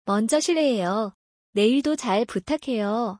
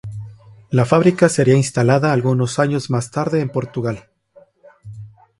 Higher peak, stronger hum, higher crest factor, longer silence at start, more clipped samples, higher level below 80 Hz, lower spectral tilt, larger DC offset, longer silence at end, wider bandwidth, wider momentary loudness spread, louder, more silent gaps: second, -10 dBFS vs 0 dBFS; neither; about the same, 14 dB vs 18 dB; about the same, 0.05 s vs 0.05 s; neither; second, -62 dBFS vs -52 dBFS; second, -4.5 dB/octave vs -6.5 dB/octave; neither; second, 0.05 s vs 0.3 s; about the same, 10.5 kHz vs 11.5 kHz; second, 7 LU vs 19 LU; second, -23 LUFS vs -17 LUFS; first, 1.14-1.53 s vs none